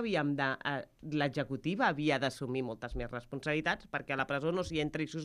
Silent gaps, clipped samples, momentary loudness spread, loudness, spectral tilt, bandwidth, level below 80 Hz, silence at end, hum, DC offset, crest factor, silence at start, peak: none; under 0.1%; 8 LU; -34 LUFS; -6 dB/octave; 13 kHz; -54 dBFS; 0 s; none; under 0.1%; 18 dB; 0 s; -16 dBFS